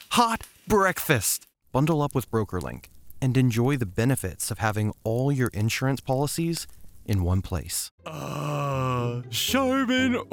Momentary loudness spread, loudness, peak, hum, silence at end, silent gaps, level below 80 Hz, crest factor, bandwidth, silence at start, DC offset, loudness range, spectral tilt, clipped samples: 9 LU; -26 LUFS; -6 dBFS; none; 0.05 s; 7.91-7.98 s; -50 dBFS; 20 dB; over 20 kHz; 0 s; under 0.1%; 3 LU; -5 dB/octave; under 0.1%